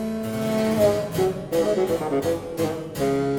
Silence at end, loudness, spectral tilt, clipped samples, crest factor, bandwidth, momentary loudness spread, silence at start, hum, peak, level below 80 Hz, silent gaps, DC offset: 0 s; -24 LUFS; -6 dB/octave; under 0.1%; 14 dB; 17.5 kHz; 7 LU; 0 s; none; -8 dBFS; -50 dBFS; none; under 0.1%